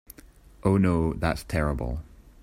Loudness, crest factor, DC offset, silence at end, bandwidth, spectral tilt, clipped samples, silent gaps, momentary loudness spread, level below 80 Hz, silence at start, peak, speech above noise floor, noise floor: -26 LUFS; 18 dB; under 0.1%; 0.2 s; 16 kHz; -7.5 dB/octave; under 0.1%; none; 11 LU; -38 dBFS; 0.1 s; -8 dBFS; 27 dB; -51 dBFS